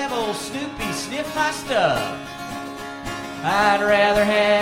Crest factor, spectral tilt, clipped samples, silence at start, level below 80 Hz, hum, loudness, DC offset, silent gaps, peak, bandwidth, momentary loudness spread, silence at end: 16 dB; -3.5 dB/octave; under 0.1%; 0 s; -46 dBFS; none; -21 LUFS; under 0.1%; none; -4 dBFS; 16.5 kHz; 15 LU; 0 s